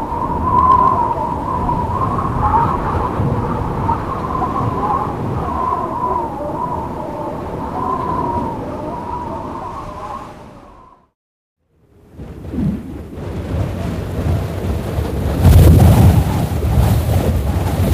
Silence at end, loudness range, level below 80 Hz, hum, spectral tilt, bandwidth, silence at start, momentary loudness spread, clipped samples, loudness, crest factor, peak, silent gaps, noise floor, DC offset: 0 s; 15 LU; -24 dBFS; none; -7.5 dB/octave; 15.5 kHz; 0 s; 16 LU; under 0.1%; -17 LUFS; 16 dB; 0 dBFS; 11.15-11.56 s; -50 dBFS; 0.3%